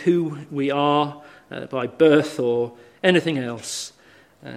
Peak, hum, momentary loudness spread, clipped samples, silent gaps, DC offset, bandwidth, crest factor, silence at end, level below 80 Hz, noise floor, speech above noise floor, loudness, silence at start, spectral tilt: -2 dBFS; none; 14 LU; under 0.1%; none; under 0.1%; 14.5 kHz; 20 dB; 0 s; -68 dBFS; -52 dBFS; 31 dB; -22 LUFS; 0 s; -5 dB/octave